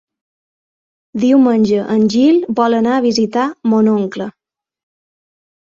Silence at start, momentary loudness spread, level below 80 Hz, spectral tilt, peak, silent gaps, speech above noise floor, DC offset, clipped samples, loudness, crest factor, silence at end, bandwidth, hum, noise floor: 1.15 s; 9 LU; -58 dBFS; -6 dB/octave; -2 dBFS; none; over 77 dB; under 0.1%; under 0.1%; -13 LUFS; 14 dB; 1.5 s; 7.6 kHz; none; under -90 dBFS